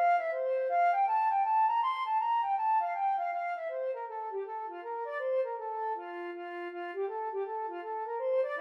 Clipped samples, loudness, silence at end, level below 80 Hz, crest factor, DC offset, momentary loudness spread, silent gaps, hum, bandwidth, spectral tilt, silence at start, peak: under 0.1%; -32 LUFS; 0 s; under -90 dBFS; 12 dB; under 0.1%; 11 LU; none; none; 6 kHz; -2.5 dB/octave; 0 s; -20 dBFS